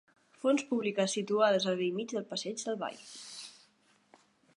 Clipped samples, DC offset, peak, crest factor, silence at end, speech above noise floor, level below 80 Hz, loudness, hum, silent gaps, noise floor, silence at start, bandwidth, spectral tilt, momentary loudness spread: under 0.1%; under 0.1%; -14 dBFS; 20 dB; 1.05 s; 36 dB; -86 dBFS; -32 LUFS; none; none; -68 dBFS; 0.45 s; 11.5 kHz; -4 dB/octave; 17 LU